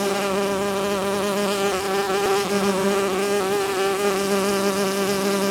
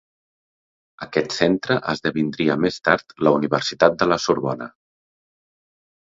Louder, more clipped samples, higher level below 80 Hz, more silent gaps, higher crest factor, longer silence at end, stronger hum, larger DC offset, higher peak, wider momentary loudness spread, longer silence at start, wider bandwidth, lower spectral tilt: about the same, -22 LUFS vs -20 LUFS; neither; about the same, -56 dBFS vs -56 dBFS; neither; second, 12 dB vs 22 dB; second, 0 s vs 1.35 s; neither; neither; second, -8 dBFS vs 0 dBFS; second, 2 LU vs 8 LU; second, 0 s vs 1 s; first, 18 kHz vs 7.8 kHz; about the same, -4 dB/octave vs -5 dB/octave